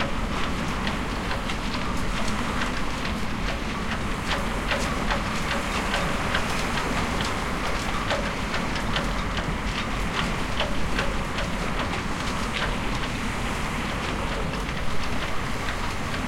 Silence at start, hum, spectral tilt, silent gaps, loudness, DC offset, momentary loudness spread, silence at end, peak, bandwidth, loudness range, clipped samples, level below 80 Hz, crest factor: 0 s; none; -4.5 dB/octave; none; -27 LUFS; under 0.1%; 3 LU; 0 s; -10 dBFS; 16.5 kHz; 2 LU; under 0.1%; -34 dBFS; 16 dB